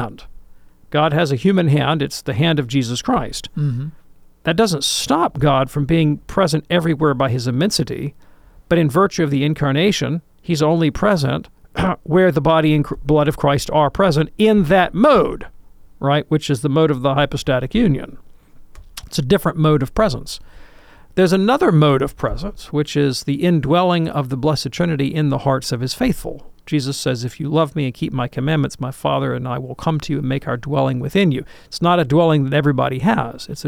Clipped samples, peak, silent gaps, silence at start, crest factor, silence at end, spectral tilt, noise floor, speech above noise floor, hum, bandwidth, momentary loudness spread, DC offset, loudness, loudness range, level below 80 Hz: under 0.1%; -4 dBFS; none; 0 s; 14 dB; 0 s; -6 dB/octave; -43 dBFS; 26 dB; none; 16 kHz; 10 LU; under 0.1%; -18 LUFS; 5 LU; -38 dBFS